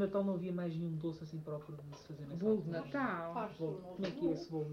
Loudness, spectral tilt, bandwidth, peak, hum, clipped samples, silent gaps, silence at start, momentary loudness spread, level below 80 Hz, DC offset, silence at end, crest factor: -40 LUFS; -8 dB/octave; 7.4 kHz; -22 dBFS; none; under 0.1%; none; 0 s; 11 LU; -70 dBFS; under 0.1%; 0 s; 16 dB